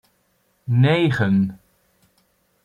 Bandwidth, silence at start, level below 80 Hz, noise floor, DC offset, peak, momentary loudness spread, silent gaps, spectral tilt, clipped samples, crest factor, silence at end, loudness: 9.2 kHz; 0.65 s; -58 dBFS; -65 dBFS; under 0.1%; -6 dBFS; 9 LU; none; -8 dB/octave; under 0.1%; 16 dB; 1.1 s; -19 LUFS